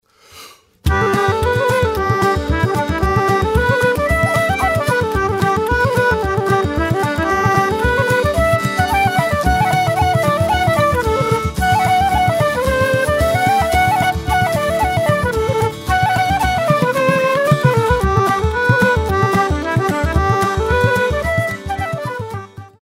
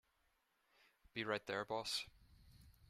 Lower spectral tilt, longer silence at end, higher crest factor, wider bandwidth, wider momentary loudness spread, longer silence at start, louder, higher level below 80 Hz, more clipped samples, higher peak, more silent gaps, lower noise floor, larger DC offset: first, -5.5 dB/octave vs -3 dB/octave; about the same, 0.15 s vs 0.2 s; second, 14 dB vs 24 dB; about the same, 16 kHz vs 15 kHz; second, 3 LU vs 8 LU; second, 0.35 s vs 1.15 s; first, -15 LUFS vs -44 LUFS; first, -28 dBFS vs -74 dBFS; neither; first, 0 dBFS vs -24 dBFS; neither; second, -41 dBFS vs -81 dBFS; neither